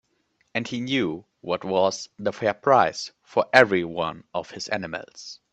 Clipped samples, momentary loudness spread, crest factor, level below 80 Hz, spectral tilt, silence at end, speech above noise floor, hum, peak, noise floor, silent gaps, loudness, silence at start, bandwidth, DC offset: under 0.1%; 16 LU; 24 dB; -64 dBFS; -4.5 dB/octave; 0.2 s; 45 dB; none; 0 dBFS; -69 dBFS; none; -24 LUFS; 0.55 s; 10.5 kHz; under 0.1%